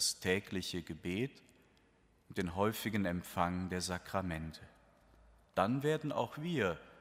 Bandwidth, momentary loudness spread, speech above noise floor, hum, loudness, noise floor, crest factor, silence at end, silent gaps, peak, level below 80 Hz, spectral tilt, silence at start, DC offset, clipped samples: 16 kHz; 8 LU; 33 dB; none; -37 LUFS; -70 dBFS; 22 dB; 0 s; none; -16 dBFS; -62 dBFS; -4.5 dB/octave; 0 s; under 0.1%; under 0.1%